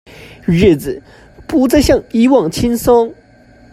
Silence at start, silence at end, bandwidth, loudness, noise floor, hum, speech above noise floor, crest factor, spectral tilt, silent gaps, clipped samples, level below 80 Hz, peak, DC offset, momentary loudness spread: 0.2 s; 0.6 s; 15 kHz; -13 LUFS; -44 dBFS; none; 32 dB; 14 dB; -6 dB/octave; none; under 0.1%; -32 dBFS; 0 dBFS; under 0.1%; 11 LU